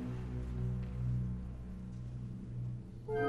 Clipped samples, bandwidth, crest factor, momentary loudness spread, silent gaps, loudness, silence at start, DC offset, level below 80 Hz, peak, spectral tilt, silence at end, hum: under 0.1%; 6.4 kHz; 16 dB; 8 LU; none; -42 LUFS; 0 s; under 0.1%; -46 dBFS; -24 dBFS; -9 dB/octave; 0 s; none